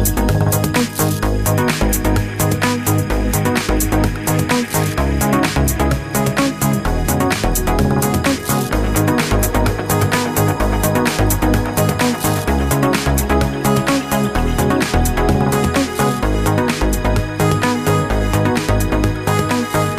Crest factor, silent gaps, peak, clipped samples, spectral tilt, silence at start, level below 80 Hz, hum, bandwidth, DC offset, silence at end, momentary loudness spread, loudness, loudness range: 12 dB; none; -2 dBFS; under 0.1%; -5 dB/octave; 0 s; -24 dBFS; none; 15.5 kHz; under 0.1%; 0 s; 2 LU; -16 LUFS; 1 LU